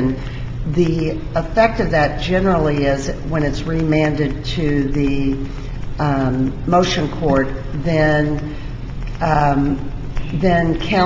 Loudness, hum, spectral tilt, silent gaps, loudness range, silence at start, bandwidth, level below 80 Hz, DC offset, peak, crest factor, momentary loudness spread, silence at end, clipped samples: -18 LUFS; none; -7 dB/octave; none; 2 LU; 0 s; 7.6 kHz; -28 dBFS; under 0.1%; -2 dBFS; 16 dB; 11 LU; 0 s; under 0.1%